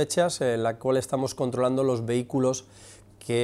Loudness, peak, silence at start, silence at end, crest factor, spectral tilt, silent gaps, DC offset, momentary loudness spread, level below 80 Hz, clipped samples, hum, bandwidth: -26 LUFS; -12 dBFS; 0 s; 0 s; 14 dB; -5 dB/octave; none; under 0.1%; 5 LU; -62 dBFS; under 0.1%; none; 14.5 kHz